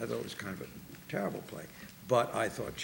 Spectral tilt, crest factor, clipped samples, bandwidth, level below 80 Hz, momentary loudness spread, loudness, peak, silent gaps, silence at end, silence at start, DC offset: -5 dB/octave; 22 dB; under 0.1%; 17 kHz; -64 dBFS; 17 LU; -36 LUFS; -14 dBFS; none; 0 s; 0 s; under 0.1%